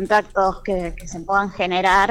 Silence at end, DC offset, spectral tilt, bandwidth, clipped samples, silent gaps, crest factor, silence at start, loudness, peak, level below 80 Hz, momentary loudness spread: 0 s; under 0.1%; -4.5 dB/octave; 16 kHz; under 0.1%; none; 16 dB; 0 s; -20 LUFS; -4 dBFS; -38 dBFS; 11 LU